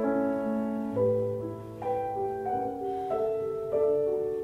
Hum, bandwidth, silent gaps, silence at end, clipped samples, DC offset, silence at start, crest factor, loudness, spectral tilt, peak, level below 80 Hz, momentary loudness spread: none; 13.5 kHz; none; 0 s; under 0.1%; under 0.1%; 0 s; 14 dB; -30 LUFS; -9 dB/octave; -16 dBFS; -60 dBFS; 6 LU